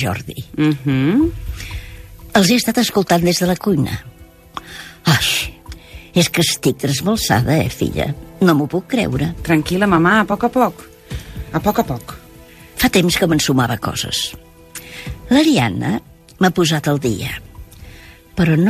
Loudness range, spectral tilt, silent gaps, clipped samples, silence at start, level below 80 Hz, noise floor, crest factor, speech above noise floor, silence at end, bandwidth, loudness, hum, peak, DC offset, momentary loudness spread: 2 LU; -5 dB/octave; none; under 0.1%; 0 s; -38 dBFS; -41 dBFS; 18 dB; 25 dB; 0 s; 15.5 kHz; -16 LUFS; none; 0 dBFS; under 0.1%; 17 LU